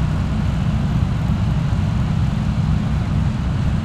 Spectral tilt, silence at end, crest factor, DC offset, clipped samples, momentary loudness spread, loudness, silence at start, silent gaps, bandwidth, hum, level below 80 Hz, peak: -8 dB/octave; 0 s; 14 dB; under 0.1%; under 0.1%; 1 LU; -20 LUFS; 0 s; none; 10 kHz; none; -26 dBFS; -4 dBFS